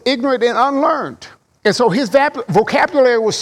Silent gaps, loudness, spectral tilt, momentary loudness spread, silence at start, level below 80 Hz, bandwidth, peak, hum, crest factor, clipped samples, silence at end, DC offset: none; -15 LUFS; -4.5 dB/octave; 5 LU; 0.05 s; -56 dBFS; 13.5 kHz; -2 dBFS; none; 12 dB; under 0.1%; 0 s; under 0.1%